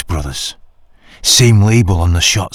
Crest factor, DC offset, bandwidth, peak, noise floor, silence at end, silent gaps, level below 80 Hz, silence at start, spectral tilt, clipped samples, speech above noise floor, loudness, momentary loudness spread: 12 dB; under 0.1%; 16 kHz; 0 dBFS; -43 dBFS; 0.05 s; none; -26 dBFS; 0 s; -4 dB/octave; under 0.1%; 31 dB; -11 LUFS; 14 LU